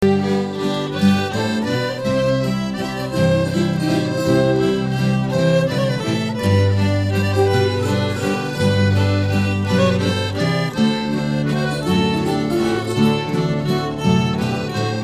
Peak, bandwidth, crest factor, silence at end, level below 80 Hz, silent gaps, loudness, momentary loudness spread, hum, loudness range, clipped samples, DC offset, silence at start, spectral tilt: -2 dBFS; 15 kHz; 16 dB; 0 s; -46 dBFS; none; -18 LUFS; 5 LU; none; 1 LU; under 0.1%; 0.2%; 0 s; -6.5 dB/octave